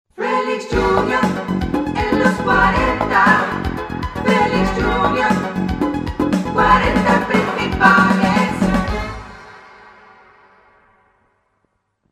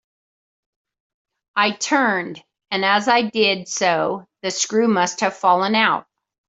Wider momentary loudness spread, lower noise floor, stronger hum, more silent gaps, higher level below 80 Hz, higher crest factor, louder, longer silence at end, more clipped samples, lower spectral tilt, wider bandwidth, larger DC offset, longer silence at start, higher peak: about the same, 9 LU vs 10 LU; second, -67 dBFS vs under -90 dBFS; neither; neither; first, -32 dBFS vs -68 dBFS; about the same, 18 dB vs 18 dB; first, -16 LUFS vs -19 LUFS; first, 2.5 s vs 0.5 s; neither; first, -6 dB/octave vs -3 dB/octave; first, 14 kHz vs 8.2 kHz; neither; second, 0.2 s vs 1.55 s; about the same, 0 dBFS vs -2 dBFS